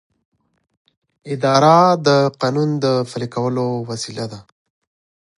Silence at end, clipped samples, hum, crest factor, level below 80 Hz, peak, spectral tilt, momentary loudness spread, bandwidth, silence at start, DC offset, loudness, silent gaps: 0.95 s; under 0.1%; none; 18 dB; -62 dBFS; 0 dBFS; -6 dB/octave; 15 LU; 11.5 kHz; 1.25 s; under 0.1%; -17 LUFS; none